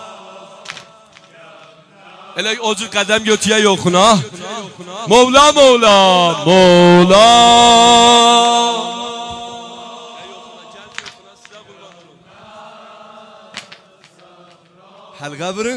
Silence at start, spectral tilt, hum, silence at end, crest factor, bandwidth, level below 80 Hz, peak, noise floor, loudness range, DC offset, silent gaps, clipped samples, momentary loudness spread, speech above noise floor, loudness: 0 s; -3.5 dB/octave; none; 0 s; 14 dB; 11 kHz; -46 dBFS; 0 dBFS; -46 dBFS; 16 LU; under 0.1%; none; under 0.1%; 25 LU; 36 dB; -9 LUFS